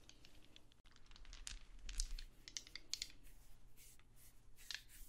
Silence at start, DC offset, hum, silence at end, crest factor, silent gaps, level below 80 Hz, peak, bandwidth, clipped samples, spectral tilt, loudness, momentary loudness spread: 0 s; under 0.1%; none; 0 s; 32 dB; 0.80-0.84 s; -56 dBFS; -20 dBFS; 16 kHz; under 0.1%; -0.5 dB/octave; -51 LUFS; 19 LU